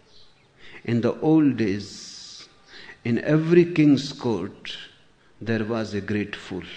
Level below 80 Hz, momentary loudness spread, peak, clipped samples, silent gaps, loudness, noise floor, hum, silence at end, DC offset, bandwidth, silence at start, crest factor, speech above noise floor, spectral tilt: -60 dBFS; 19 LU; -6 dBFS; under 0.1%; none; -23 LUFS; -55 dBFS; none; 0 s; under 0.1%; 9 kHz; 0.65 s; 18 dB; 33 dB; -7 dB/octave